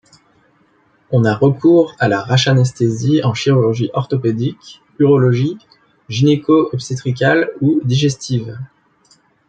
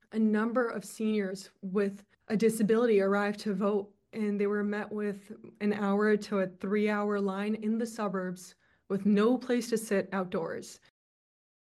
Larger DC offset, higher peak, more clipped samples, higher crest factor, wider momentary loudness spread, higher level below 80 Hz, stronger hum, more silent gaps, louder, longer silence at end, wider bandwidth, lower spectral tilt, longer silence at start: neither; first, -2 dBFS vs -16 dBFS; neither; about the same, 14 dB vs 16 dB; about the same, 9 LU vs 11 LU; first, -54 dBFS vs -76 dBFS; neither; neither; first, -15 LUFS vs -30 LUFS; second, 0.8 s vs 1.05 s; second, 9 kHz vs 12.5 kHz; about the same, -6.5 dB/octave vs -6.5 dB/octave; first, 1.1 s vs 0.1 s